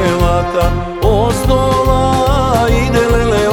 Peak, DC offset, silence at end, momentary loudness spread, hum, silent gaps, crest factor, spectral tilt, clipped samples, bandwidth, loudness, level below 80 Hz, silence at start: 0 dBFS; under 0.1%; 0 s; 3 LU; none; none; 12 dB; -6 dB/octave; under 0.1%; 19 kHz; -13 LUFS; -18 dBFS; 0 s